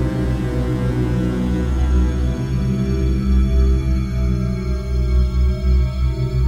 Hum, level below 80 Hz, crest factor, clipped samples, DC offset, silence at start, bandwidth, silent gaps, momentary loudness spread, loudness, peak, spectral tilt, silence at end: none; -18 dBFS; 12 dB; under 0.1%; under 0.1%; 0 s; 7.4 kHz; none; 4 LU; -19 LUFS; -6 dBFS; -8 dB/octave; 0 s